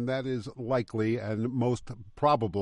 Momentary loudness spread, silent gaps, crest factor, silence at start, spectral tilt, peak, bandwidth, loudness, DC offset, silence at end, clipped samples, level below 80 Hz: 9 LU; none; 18 dB; 0 s; -7.5 dB/octave; -12 dBFS; 10.5 kHz; -30 LUFS; under 0.1%; 0 s; under 0.1%; -58 dBFS